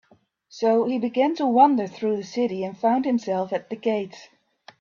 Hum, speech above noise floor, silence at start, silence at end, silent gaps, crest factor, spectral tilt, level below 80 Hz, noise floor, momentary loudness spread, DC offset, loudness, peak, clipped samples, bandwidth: none; 36 dB; 0.55 s; 0.55 s; none; 18 dB; -6.5 dB/octave; -72 dBFS; -59 dBFS; 9 LU; under 0.1%; -23 LUFS; -4 dBFS; under 0.1%; 7.2 kHz